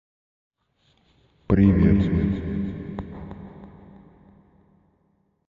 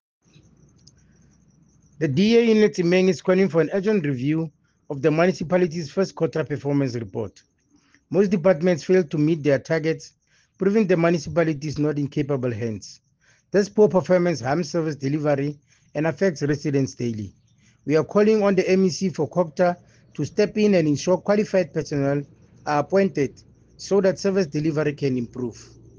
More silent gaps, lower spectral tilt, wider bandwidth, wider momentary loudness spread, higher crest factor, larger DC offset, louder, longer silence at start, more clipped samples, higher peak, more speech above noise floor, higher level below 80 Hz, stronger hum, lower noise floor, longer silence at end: neither; first, -11 dB/octave vs -6.5 dB/octave; second, 4.5 kHz vs 7.6 kHz; first, 24 LU vs 12 LU; about the same, 20 dB vs 18 dB; neither; about the same, -22 LUFS vs -22 LUFS; second, 1.5 s vs 2 s; neither; about the same, -6 dBFS vs -4 dBFS; first, 48 dB vs 40 dB; first, -36 dBFS vs -58 dBFS; neither; first, -67 dBFS vs -61 dBFS; first, 1.9 s vs 0.35 s